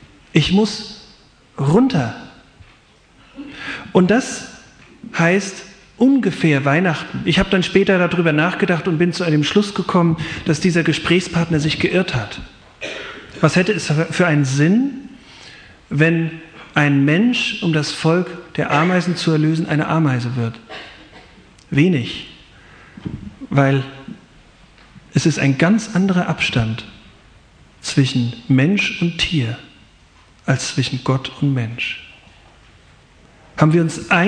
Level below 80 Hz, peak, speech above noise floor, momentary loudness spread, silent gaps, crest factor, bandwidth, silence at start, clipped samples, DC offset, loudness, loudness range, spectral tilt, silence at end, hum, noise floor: -46 dBFS; 0 dBFS; 34 dB; 17 LU; none; 18 dB; 10 kHz; 0.35 s; under 0.1%; under 0.1%; -17 LUFS; 6 LU; -6 dB/octave; 0 s; none; -50 dBFS